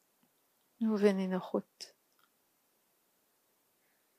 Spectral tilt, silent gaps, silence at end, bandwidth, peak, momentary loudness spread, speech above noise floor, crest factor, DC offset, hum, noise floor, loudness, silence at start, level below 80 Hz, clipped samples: -7 dB/octave; none; 2.35 s; 15 kHz; -14 dBFS; 21 LU; 43 dB; 24 dB; under 0.1%; none; -75 dBFS; -33 LUFS; 0.8 s; under -90 dBFS; under 0.1%